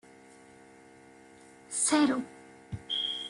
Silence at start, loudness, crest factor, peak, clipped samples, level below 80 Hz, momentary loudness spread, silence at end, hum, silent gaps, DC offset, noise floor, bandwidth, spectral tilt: 1.7 s; -29 LUFS; 22 dB; -12 dBFS; under 0.1%; -66 dBFS; 21 LU; 0 s; none; none; under 0.1%; -55 dBFS; 11.5 kHz; -2 dB/octave